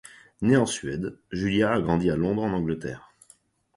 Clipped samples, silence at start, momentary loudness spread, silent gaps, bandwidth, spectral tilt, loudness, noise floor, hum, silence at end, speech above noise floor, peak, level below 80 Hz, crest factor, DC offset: under 0.1%; 0.4 s; 11 LU; none; 11.5 kHz; -6 dB/octave; -25 LUFS; -60 dBFS; none; 0.8 s; 35 dB; -8 dBFS; -50 dBFS; 18 dB; under 0.1%